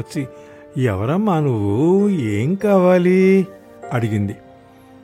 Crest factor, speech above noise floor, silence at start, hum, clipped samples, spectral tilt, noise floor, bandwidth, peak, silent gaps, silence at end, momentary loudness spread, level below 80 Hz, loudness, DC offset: 14 dB; 28 dB; 0 s; none; under 0.1%; -8.5 dB/octave; -44 dBFS; 12.5 kHz; -2 dBFS; none; 0.65 s; 15 LU; -58 dBFS; -17 LUFS; under 0.1%